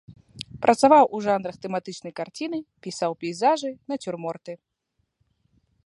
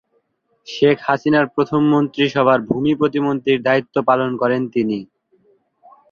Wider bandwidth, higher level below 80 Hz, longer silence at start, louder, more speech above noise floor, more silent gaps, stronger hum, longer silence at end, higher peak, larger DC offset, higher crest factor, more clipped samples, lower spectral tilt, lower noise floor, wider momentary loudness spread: first, 11.5 kHz vs 7 kHz; second, -66 dBFS vs -58 dBFS; second, 0.1 s vs 0.7 s; second, -24 LUFS vs -17 LUFS; about the same, 52 dB vs 49 dB; neither; neither; first, 1.3 s vs 1.05 s; about the same, -2 dBFS vs -2 dBFS; neither; first, 22 dB vs 16 dB; neither; second, -5 dB/octave vs -7 dB/octave; first, -75 dBFS vs -65 dBFS; first, 21 LU vs 4 LU